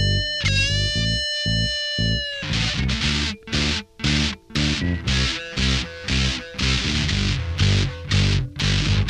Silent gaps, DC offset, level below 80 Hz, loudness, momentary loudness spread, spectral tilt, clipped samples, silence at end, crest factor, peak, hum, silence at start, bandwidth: none; under 0.1%; -30 dBFS; -21 LUFS; 4 LU; -4 dB/octave; under 0.1%; 0 s; 14 dB; -6 dBFS; none; 0 s; 11 kHz